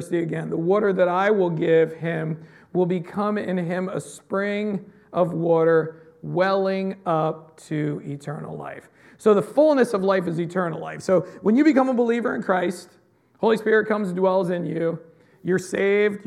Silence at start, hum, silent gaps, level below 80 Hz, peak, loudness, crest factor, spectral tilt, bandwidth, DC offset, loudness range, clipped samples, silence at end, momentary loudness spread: 0 s; none; none; -72 dBFS; -4 dBFS; -22 LUFS; 18 dB; -7 dB/octave; 13 kHz; under 0.1%; 4 LU; under 0.1%; 0.05 s; 14 LU